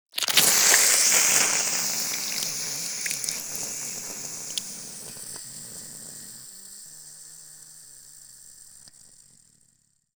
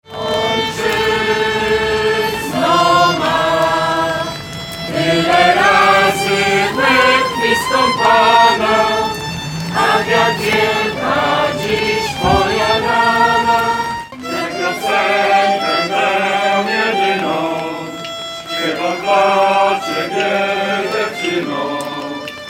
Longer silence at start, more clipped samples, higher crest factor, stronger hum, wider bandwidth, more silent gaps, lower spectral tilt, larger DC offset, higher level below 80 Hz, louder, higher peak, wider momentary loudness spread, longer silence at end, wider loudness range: about the same, 0.15 s vs 0.1 s; neither; first, 26 dB vs 14 dB; neither; first, over 20 kHz vs 17 kHz; neither; second, 1.5 dB/octave vs -3.5 dB/octave; neither; second, -68 dBFS vs -42 dBFS; second, -21 LUFS vs -14 LUFS; about the same, -2 dBFS vs 0 dBFS; first, 26 LU vs 11 LU; first, 1.3 s vs 0 s; first, 24 LU vs 4 LU